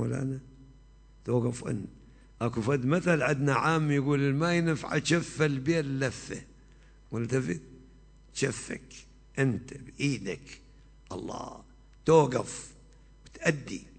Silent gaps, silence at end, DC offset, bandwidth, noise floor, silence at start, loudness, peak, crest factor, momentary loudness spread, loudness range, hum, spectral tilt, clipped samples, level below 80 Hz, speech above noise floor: none; 0.15 s; under 0.1%; 9.2 kHz; -55 dBFS; 0 s; -29 LUFS; -10 dBFS; 22 dB; 16 LU; 8 LU; none; -6 dB/octave; under 0.1%; -56 dBFS; 26 dB